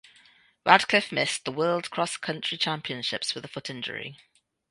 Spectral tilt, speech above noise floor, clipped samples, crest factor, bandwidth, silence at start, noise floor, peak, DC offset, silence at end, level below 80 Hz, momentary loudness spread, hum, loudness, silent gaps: -3 dB/octave; 32 dB; under 0.1%; 28 dB; 11.5 kHz; 0.65 s; -59 dBFS; 0 dBFS; under 0.1%; 0.55 s; -70 dBFS; 14 LU; none; -26 LUFS; none